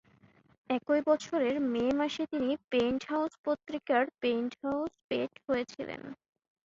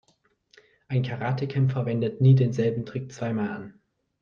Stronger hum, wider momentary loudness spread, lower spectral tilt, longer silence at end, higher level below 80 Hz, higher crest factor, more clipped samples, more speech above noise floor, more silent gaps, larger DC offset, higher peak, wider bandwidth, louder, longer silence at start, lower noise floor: neither; second, 7 LU vs 13 LU; second, -5 dB/octave vs -8.5 dB/octave; about the same, 0.5 s vs 0.5 s; about the same, -68 dBFS vs -64 dBFS; about the same, 18 dB vs 18 dB; neither; second, 32 dB vs 44 dB; first, 2.64-2.68 s, 3.39-3.44 s, 5.04-5.09 s vs none; neither; second, -14 dBFS vs -8 dBFS; first, 7.8 kHz vs 6.8 kHz; second, -32 LUFS vs -25 LUFS; second, 0.7 s vs 0.9 s; second, -63 dBFS vs -68 dBFS